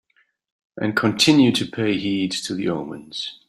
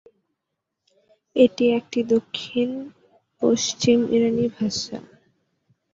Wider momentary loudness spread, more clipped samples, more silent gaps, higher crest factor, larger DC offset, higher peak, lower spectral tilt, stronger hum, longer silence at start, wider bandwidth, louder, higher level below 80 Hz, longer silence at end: about the same, 14 LU vs 12 LU; neither; neither; about the same, 18 dB vs 20 dB; neither; about the same, -2 dBFS vs -4 dBFS; about the same, -4.5 dB/octave vs -4.5 dB/octave; neither; second, 0.75 s vs 1.35 s; first, 15.5 kHz vs 7.8 kHz; about the same, -20 LUFS vs -22 LUFS; about the same, -60 dBFS vs -62 dBFS; second, 0.15 s vs 0.95 s